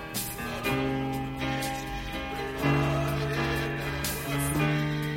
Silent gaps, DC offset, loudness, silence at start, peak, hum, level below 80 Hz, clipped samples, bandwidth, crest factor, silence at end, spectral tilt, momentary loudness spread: none; under 0.1%; -29 LUFS; 0 s; -12 dBFS; none; -42 dBFS; under 0.1%; 16.5 kHz; 16 dB; 0 s; -5 dB/octave; 7 LU